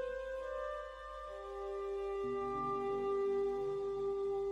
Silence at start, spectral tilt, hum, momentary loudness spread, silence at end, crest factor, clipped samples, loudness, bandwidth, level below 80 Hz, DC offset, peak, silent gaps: 0 s; -6.5 dB/octave; none; 10 LU; 0 s; 10 dB; under 0.1%; -39 LUFS; 8.4 kHz; -60 dBFS; under 0.1%; -28 dBFS; none